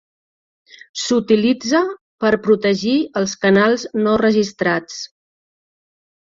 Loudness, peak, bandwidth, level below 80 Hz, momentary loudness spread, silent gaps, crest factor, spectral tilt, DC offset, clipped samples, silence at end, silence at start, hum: -17 LUFS; -2 dBFS; 7.6 kHz; -56 dBFS; 10 LU; 2.01-2.18 s; 16 dB; -5 dB/octave; under 0.1%; under 0.1%; 1.15 s; 0.95 s; none